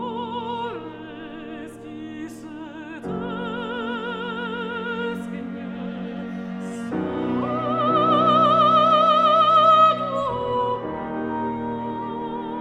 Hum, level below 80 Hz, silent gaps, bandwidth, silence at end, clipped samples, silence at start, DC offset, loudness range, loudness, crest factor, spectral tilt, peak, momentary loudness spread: none; -56 dBFS; none; 10 kHz; 0 s; under 0.1%; 0 s; under 0.1%; 15 LU; -22 LUFS; 18 dB; -6.5 dB/octave; -6 dBFS; 20 LU